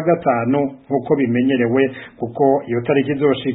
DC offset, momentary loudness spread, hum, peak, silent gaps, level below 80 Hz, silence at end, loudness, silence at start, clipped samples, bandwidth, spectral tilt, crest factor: under 0.1%; 5 LU; none; -2 dBFS; none; -58 dBFS; 0 s; -18 LUFS; 0 s; under 0.1%; 4 kHz; -12 dB/octave; 14 dB